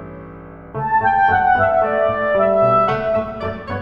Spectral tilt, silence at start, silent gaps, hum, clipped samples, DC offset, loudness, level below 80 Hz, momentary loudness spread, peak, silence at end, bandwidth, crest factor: -8 dB/octave; 0 s; none; none; under 0.1%; under 0.1%; -16 LUFS; -42 dBFS; 16 LU; -4 dBFS; 0 s; 5.8 kHz; 14 dB